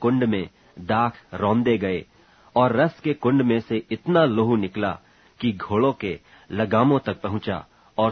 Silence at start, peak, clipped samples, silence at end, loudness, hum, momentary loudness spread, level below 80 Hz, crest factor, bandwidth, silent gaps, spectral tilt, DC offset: 0 s; -4 dBFS; under 0.1%; 0 s; -23 LUFS; none; 12 LU; -56 dBFS; 18 dB; 6.4 kHz; none; -9 dB/octave; under 0.1%